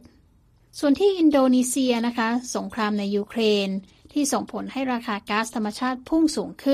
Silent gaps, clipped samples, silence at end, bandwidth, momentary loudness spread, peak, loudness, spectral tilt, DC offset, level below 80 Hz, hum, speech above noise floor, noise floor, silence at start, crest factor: none; under 0.1%; 0 s; 15.5 kHz; 10 LU; -10 dBFS; -23 LUFS; -4 dB/octave; under 0.1%; -58 dBFS; none; 36 dB; -58 dBFS; 0.75 s; 14 dB